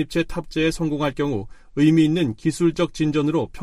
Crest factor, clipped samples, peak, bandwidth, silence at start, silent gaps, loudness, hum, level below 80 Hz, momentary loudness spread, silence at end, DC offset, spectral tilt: 16 dB; under 0.1%; -6 dBFS; 12 kHz; 0 s; none; -21 LUFS; none; -42 dBFS; 8 LU; 0 s; under 0.1%; -6.5 dB/octave